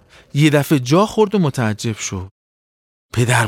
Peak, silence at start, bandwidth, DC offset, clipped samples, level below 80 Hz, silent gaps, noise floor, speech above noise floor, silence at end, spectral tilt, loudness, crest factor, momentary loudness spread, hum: -2 dBFS; 0.35 s; 17 kHz; under 0.1%; under 0.1%; -50 dBFS; 2.31-3.09 s; under -90 dBFS; over 74 dB; 0 s; -5.5 dB/octave; -17 LUFS; 16 dB; 11 LU; none